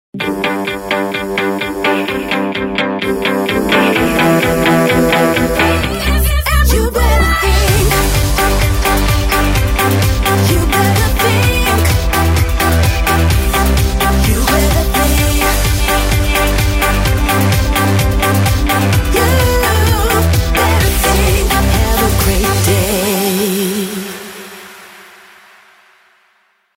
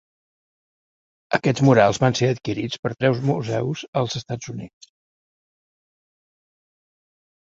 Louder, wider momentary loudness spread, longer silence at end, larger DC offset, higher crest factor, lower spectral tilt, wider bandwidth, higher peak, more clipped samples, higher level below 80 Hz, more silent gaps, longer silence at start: first, -13 LUFS vs -21 LUFS; second, 5 LU vs 15 LU; second, 1.75 s vs 2.9 s; neither; second, 12 dB vs 22 dB; second, -4.5 dB/octave vs -6 dB/octave; first, 16.5 kHz vs 7.8 kHz; about the same, 0 dBFS vs -2 dBFS; neither; first, -18 dBFS vs -56 dBFS; second, none vs 2.79-2.83 s, 3.88-3.93 s; second, 0.15 s vs 1.3 s